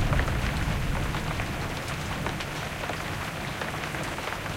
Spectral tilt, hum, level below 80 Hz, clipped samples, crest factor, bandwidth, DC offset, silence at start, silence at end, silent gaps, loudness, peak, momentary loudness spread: -5 dB/octave; none; -36 dBFS; under 0.1%; 20 dB; 17 kHz; under 0.1%; 0 s; 0 s; none; -31 LUFS; -10 dBFS; 4 LU